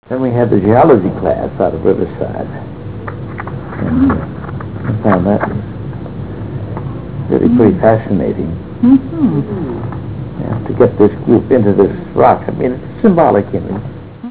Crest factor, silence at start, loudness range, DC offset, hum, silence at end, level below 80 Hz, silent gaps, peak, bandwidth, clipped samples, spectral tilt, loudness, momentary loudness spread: 14 dB; 0.05 s; 5 LU; 1%; none; 0 s; -34 dBFS; none; 0 dBFS; 4 kHz; under 0.1%; -13 dB/octave; -13 LUFS; 15 LU